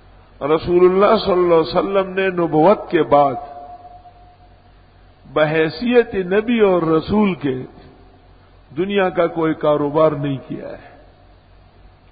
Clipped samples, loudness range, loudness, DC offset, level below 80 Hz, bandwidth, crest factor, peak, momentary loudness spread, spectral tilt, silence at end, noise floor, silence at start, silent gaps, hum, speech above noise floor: under 0.1%; 5 LU; -17 LUFS; under 0.1%; -46 dBFS; 5 kHz; 18 dB; 0 dBFS; 16 LU; -11.5 dB/octave; 1.3 s; -47 dBFS; 0.4 s; none; none; 31 dB